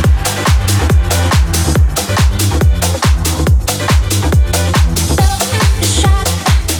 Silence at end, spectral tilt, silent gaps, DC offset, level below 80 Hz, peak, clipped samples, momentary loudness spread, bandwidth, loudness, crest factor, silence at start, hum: 0 s; -4.5 dB/octave; none; under 0.1%; -14 dBFS; -2 dBFS; under 0.1%; 1 LU; over 20 kHz; -12 LUFS; 8 dB; 0 s; none